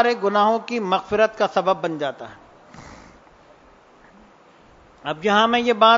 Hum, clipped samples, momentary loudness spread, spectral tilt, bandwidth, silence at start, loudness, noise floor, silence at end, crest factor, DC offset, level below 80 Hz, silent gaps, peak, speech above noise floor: none; under 0.1%; 20 LU; -4.5 dB/octave; 7.6 kHz; 0 s; -20 LUFS; -51 dBFS; 0 s; 20 dB; under 0.1%; -58 dBFS; none; -2 dBFS; 32 dB